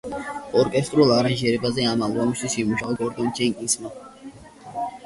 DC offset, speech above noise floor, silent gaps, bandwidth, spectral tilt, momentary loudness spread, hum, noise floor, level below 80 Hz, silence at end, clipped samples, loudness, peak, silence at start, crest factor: under 0.1%; 21 dB; none; 11.5 kHz; -4.5 dB/octave; 19 LU; none; -43 dBFS; -54 dBFS; 0 s; under 0.1%; -22 LUFS; -4 dBFS; 0.05 s; 18 dB